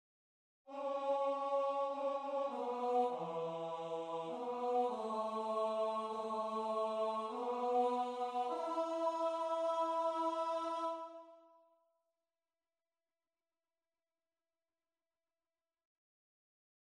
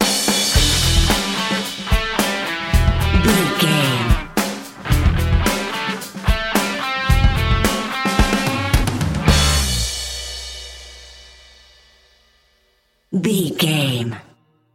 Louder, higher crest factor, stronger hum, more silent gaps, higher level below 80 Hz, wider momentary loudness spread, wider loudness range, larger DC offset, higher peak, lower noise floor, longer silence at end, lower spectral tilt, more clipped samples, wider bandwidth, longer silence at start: second, -39 LUFS vs -18 LUFS; about the same, 16 dB vs 18 dB; neither; neither; second, under -90 dBFS vs -24 dBFS; second, 6 LU vs 11 LU; second, 4 LU vs 8 LU; neither; second, -24 dBFS vs 0 dBFS; first, under -90 dBFS vs -62 dBFS; first, 5.5 s vs 0.55 s; about the same, -5 dB/octave vs -4 dB/octave; neither; second, 10.5 kHz vs 17 kHz; first, 0.65 s vs 0 s